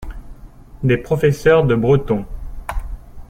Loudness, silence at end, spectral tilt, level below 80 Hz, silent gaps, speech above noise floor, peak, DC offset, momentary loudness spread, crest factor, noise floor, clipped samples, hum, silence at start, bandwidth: -16 LUFS; 0.05 s; -7.5 dB/octave; -30 dBFS; none; 23 dB; -2 dBFS; under 0.1%; 20 LU; 16 dB; -38 dBFS; under 0.1%; none; 0 s; 15.5 kHz